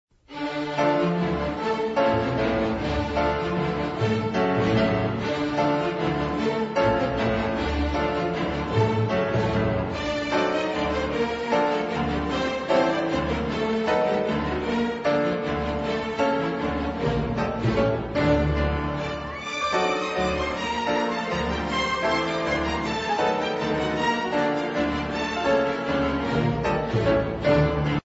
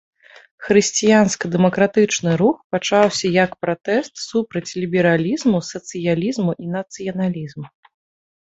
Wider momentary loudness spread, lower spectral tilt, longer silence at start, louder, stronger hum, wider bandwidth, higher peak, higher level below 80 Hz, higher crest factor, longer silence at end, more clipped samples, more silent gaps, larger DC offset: second, 4 LU vs 11 LU; first, -6.5 dB/octave vs -5 dB/octave; second, 0.3 s vs 0.6 s; second, -24 LUFS vs -19 LUFS; neither; about the same, 8 kHz vs 8.2 kHz; second, -8 dBFS vs -2 dBFS; first, -38 dBFS vs -58 dBFS; about the same, 16 dB vs 18 dB; second, 0.05 s vs 0.9 s; neither; second, none vs 2.64-2.70 s; neither